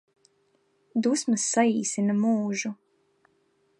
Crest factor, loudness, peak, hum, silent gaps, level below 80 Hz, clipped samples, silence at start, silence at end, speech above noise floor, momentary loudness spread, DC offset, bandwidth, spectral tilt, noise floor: 18 dB; -25 LUFS; -8 dBFS; none; none; -80 dBFS; under 0.1%; 0.95 s; 1.05 s; 44 dB; 9 LU; under 0.1%; 11.5 kHz; -4 dB/octave; -69 dBFS